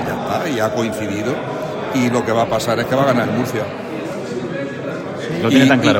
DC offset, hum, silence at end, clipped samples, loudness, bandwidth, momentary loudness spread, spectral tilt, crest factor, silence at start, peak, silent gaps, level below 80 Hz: under 0.1%; none; 0 s; under 0.1%; -18 LUFS; 16.5 kHz; 11 LU; -5.5 dB/octave; 18 dB; 0 s; 0 dBFS; none; -52 dBFS